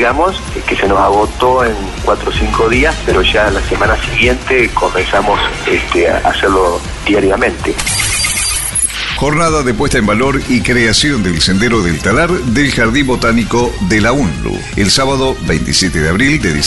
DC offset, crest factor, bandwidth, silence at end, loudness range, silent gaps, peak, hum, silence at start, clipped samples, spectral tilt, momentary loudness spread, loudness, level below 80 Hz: under 0.1%; 12 dB; 12 kHz; 0 s; 1 LU; none; 0 dBFS; none; 0 s; under 0.1%; -4 dB/octave; 4 LU; -12 LUFS; -24 dBFS